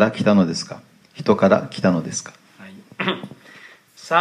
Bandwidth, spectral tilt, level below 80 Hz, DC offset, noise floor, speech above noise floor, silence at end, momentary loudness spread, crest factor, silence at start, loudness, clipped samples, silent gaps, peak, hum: 11 kHz; -5.5 dB/octave; -62 dBFS; under 0.1%; -46 dBFS; 27 dB; 0 s; 23 LU; 20 dB; 0 s; -20 LUFS; under 0.1%; none; 0 dBFS; none